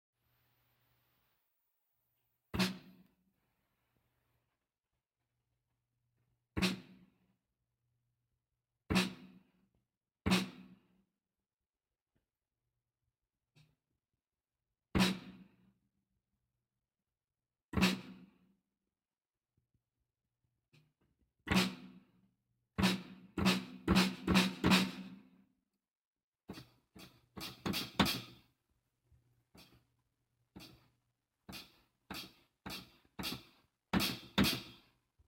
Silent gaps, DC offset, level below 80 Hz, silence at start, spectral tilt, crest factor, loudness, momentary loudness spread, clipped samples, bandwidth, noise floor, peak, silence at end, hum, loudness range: 12.02-12.06 s, 17.65-17.69 s, 20.68-20.72 s, 26.07-26.13 s, 26.23-26.32 s; under 0.1%; -58 dBFS; 2.55 s; -4.5 dB/octave; 26 dB; -35 LUFS; 23 LU; under 0.1%; 16.5 kHz; under -90 dBFS; -14 dBFS; 0.55 s; none; 13 LU